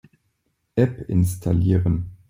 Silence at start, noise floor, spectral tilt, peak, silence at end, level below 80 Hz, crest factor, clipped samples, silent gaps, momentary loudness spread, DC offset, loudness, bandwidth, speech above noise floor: 0.75 s; -71 dBFS; -8.5 dB/octave; -6 dBFS; 0.15 s; -44 dBFS; 16 dB; under 0.1%; none; 4 LU; under 0.1%; -22 LUFS; 16 kHz; 52 dB